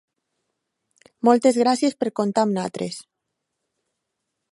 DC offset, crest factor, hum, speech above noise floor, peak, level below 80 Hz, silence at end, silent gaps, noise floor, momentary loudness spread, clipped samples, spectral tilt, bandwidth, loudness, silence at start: under 0.1%; 22 dB; none; 60 dB; -2 dBFS; -72 dBFS; 1.5 s; none; -80 dBFS; 14 LU; under 0.1%; -5 dB/octave; 11.5 kHz; -21 LUFS; 1.25 s